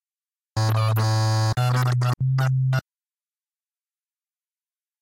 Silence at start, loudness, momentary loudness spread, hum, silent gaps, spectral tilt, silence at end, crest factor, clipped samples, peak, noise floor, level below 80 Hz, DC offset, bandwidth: 0.55 s; -22 LUFS; 4 LU; none; none; -6 dB/octave; 2.2 s; 12 dB; under 0.1%; -12 dBFS; under -90 dBFS; -54 dBFS; under 0.1%; 16.5 kHz